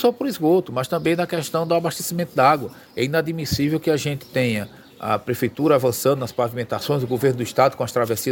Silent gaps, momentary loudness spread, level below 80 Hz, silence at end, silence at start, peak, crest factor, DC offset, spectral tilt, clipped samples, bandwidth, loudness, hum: none; 7 LU; -52 dBFS; 0 s; 0 s; -2 dBFS; 18 dB; under 0.1%; -5.5 dB/octave; under 0.1%; 17 kHz; -21 LUFS; none